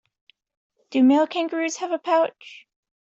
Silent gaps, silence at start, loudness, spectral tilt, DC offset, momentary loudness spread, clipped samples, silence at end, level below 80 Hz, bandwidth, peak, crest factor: none; 0.9 s; -22 LUFS; -3 dB/octave; under 0.1%; 13 LU; under 0.1%; 0.6 s; -72 dBFS; 7.8 kHz; -8 dBFS; 16 dB